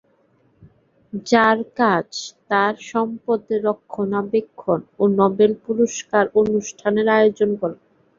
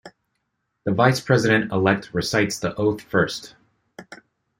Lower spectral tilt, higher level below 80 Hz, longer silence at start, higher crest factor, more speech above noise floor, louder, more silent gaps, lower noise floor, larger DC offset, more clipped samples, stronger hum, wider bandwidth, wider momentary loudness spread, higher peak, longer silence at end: about the same, -5 dB/octave vs -5.5 dB/octave; about the same, -60 dBFS vs -56 dBFS; first, 1.15 s vs 0.05 s; about the same, 18 dB vs 20 dB; second, 41 dB vs 55 dB; about the same, -20 LUFS vs -21 LUFS; neither; second, -60 dBFS vs -75 dBFS; neither; neither; neither; second, 7.6 kHz vs 16.5 kHz; second, 8 LU vs 13 LU; about the same, -2 dBFS vs -2 dBFS; about the same, 0.45 s vs 0.45 s